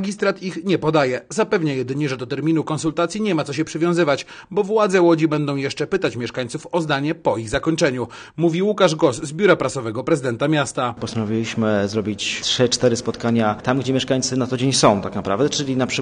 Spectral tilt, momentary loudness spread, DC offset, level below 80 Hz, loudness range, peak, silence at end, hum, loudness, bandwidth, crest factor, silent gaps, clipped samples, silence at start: -5 dB/octave; 7 LU; under 0.1%; -52 dBFS; 2 LU; -2 dBFS; 0 s; none; -20 LUFS; 10 kHz; 18 dB; none; under 0.1%; 0 s